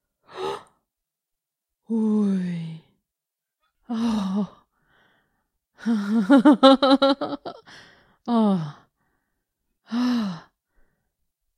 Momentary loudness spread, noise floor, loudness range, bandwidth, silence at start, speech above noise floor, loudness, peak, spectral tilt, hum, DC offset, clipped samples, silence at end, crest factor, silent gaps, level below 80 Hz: 20 LU; -86 dBFS; 10 LU; 10.5 kHz; 0.35 s; 68 dB; -21 LUFS; 0 dBFS; -6.5 dB/octave; none; under 0.1%; under 0.1%; 1.2 s; 24 dB; none; -66 dBFS